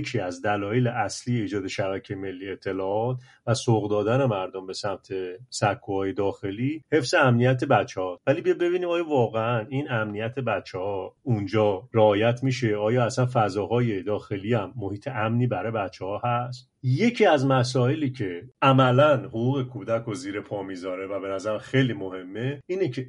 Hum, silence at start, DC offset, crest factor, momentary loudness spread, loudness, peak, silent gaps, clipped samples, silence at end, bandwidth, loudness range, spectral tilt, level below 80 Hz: none; 0 s; under 0.1%; 20 dB; 12 LU; -25 LUFS; -4 dBFS; none; under 0.1%; 0 s; 11 kHz; 5 LU; -6.5 dB/octave; -64 dBFS